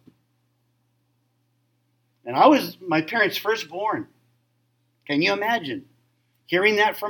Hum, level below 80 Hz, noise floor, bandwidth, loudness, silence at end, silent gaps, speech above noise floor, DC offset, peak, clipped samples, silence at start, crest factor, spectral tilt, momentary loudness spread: none; -78 dBFS; -69 dBFS; 17.5 kHz; -22 LUFS; 0 s; none; 48 dB; under 0.1%; -4 dBFS; under 0.1%; 2.25 s; 22 dB; -4.5 dB/octave; 15 LU